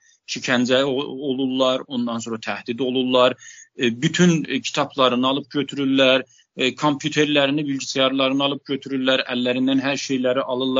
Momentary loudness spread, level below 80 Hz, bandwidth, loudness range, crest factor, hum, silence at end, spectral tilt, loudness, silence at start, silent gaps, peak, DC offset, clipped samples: 9 LU; -68 dBFS; 7.8 kHz; 2 LU; 18 dB; none; 0 s; -3.5 dB/octave; -20 LUFS; 0.3 s; none; -2 dBFS; under 0.1%; under 0.1%